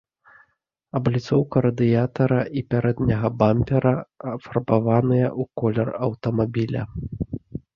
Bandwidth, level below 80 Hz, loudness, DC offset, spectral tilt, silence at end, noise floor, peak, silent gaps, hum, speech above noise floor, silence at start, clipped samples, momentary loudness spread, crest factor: 6.8 kHz; -46 dBFS; -22 LUFS; under 0.1%; -9.5 dB/octave; 0.15 s; -68 dBFS; -2 dBFS; none; none; 47 dB; 0.95 s; under 0.1%; 11 LU; 20 dB